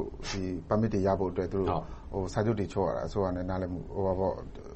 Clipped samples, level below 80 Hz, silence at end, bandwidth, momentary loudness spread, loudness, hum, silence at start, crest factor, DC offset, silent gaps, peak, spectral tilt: under 0.1%; -44 dBFS; 0 s; 8.4 kHz; 7 LU; -31 LUFS; none; 0 s; 18 dB; under 0.1%; none; -12 dBFS; -7 dB/octave